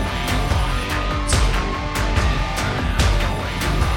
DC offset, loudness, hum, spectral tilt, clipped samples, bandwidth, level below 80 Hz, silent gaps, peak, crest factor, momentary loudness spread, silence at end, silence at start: under 0.1%; -21 LUFS; none; -4.5 dB/octave; under 0.1%; 17 kHz; -22 dBFS; none; -4 dBFS; 16 dB; 4 LU; 0 s; 0 s